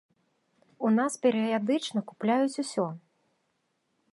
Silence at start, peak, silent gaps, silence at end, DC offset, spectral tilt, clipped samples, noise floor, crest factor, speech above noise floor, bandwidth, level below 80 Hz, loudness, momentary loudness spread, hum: 0.8 s; -12 dBFS; none; 1.15 s; under 0.1%; -5 dB/octave; under 0.1%; -76 dBFS; 18 dB; 49 dB; 11.5 kHz; -82 dBFS; -28 LUFS; 7 LU; none